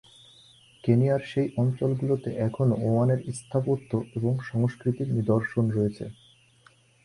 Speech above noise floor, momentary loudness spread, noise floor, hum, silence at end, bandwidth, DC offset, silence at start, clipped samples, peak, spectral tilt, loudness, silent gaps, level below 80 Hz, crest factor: 34 dB; 6 LU; -59 dBFS; none; 0.95 s; 11 kHz; under 0.1%; 0.85 s; under 0.1%; -8 dBFS; -8.5 dB/octave; -26 LUFS; none; -58 dBFS; 18 dB